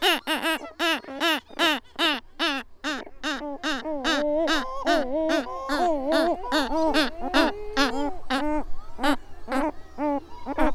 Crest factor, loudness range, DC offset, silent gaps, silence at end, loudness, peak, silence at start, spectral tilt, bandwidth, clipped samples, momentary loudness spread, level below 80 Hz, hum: 22 dB; 2 LU; under 0.1%; none; 0 s; -26 LUFS; -4 dBFS; 0 s; -2.5 dB/octave; 16.5 kHz; under 0.1%; 8 LU; -40 dBFS; none